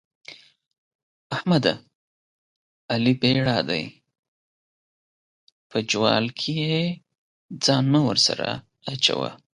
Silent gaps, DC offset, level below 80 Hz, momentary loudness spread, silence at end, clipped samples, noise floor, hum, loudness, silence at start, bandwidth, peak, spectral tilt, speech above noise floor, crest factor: 0.67-0.71 s, 0.78-1.30 s, 1.95-2.89 s, 4.19-5.70 s, 7.18-7.49 s; under 0.1%; -60 dBFS; 15 LU; 0.2 s; under 0.1%; under -90 dBFS; none; -22 LUFS; 0.3 s; 11.5 kHz; -4 dBFS; -4.5 dB/octave; over 68 dB; 22 dB